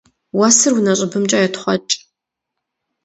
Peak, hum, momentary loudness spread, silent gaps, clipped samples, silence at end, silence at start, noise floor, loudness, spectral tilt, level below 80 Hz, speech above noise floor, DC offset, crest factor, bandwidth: 0 dBFS; none; 11 LU; none; under 0.1%; 1.1 s; 0.35 s; -80 dBFS; -15 LUFS; -3 dB/octave; -64 dBFS; 65 dB; under 0.1%; 18 dB; 9 kHz